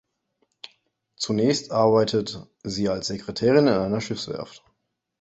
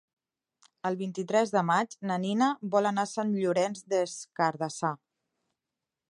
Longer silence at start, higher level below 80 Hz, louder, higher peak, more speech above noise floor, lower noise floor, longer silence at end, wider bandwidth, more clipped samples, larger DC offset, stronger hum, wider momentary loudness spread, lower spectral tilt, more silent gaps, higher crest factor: first, 1.2 s vs 0.85 s; first, -56 dBFS vs -82 dBFS; first, -23 LUFS vs -29 LUFS; first, -6 dBFS vs -12 dBFS; second, 52 dB vs 60 dB; second, -74 dBFS vs -88 dBFS; second, 0.65 s vs 1.15 s; second, 8.2 kHz vs 11.5 kHz; neither; neither; neither; first, 21 LU vs 8 LU; about the same, -5.5 dB/octave vs -5 dB/octave; neither; about the same, 20 dB vs 18 dB